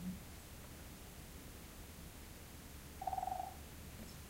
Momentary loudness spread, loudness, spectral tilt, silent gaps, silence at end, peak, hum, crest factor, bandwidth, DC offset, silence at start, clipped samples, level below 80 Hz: 11 LU; -50 LUFS; -4.5 dB/octave; none; 0 s; -28 dBFS; none; 22 dB; 16 kHz; under 0.1%; 0 s; under 0.1%; -58 dBFS